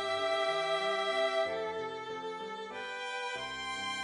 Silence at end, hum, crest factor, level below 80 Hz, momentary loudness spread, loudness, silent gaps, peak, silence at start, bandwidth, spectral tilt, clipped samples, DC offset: 0 s; none; 14 dB; -72 dBFS; 9 LU; -34 LUFS; none; -20 dBFS; 0 s; 11.5 kHz; -2 dB/octave; under 0.1%; under 0.1%